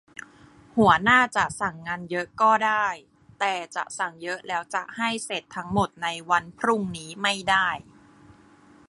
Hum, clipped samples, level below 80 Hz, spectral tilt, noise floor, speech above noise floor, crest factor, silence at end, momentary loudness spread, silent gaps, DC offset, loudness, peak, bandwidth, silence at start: none; under 0.1%; -56 dBFS; -4 dB/octave; -54 dBFS; 29 dB; 20 dB; 1.1 s; 13 LU; none; under 0.1%; -24 LUFS; -4 dBFS; 11.5 kHz; 0.75 s